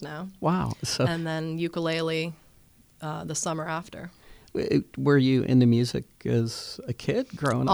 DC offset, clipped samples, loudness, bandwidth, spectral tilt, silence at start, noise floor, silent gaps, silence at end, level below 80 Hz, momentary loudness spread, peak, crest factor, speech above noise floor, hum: under 0.1%; under 0.1%; -27 LUFS; over 20 kHz; -6 dB/octave; 0 s; -58 dBFS; none; 0 s; -56 dBFS; 14 LU; -8 dBFS; 18 dB; 32 dB; none